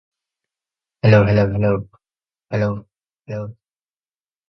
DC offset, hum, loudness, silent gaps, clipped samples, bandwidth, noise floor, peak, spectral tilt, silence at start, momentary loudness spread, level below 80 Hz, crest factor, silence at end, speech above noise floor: under 0.1%; none; -18 LUFS; none; under 0.1%; 6.2 kHz; under -90 dBFS; 0 dBFS; -9 dB/octave; 1.05 s; 18 LU; -44 dBFS; 20 dB; 0.95 s; over 74 dB